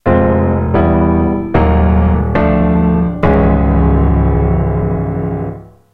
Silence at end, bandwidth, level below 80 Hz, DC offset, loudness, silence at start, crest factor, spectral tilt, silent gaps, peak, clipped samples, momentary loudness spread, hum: 0.3 s; 4.1 kHz; -18 dBFS; under 0.1%; -13 LUFS; 0.05 s; 12 dB; -11.5 dB/octave; none; 0 dBFS; under 0.1%; 6 LU; none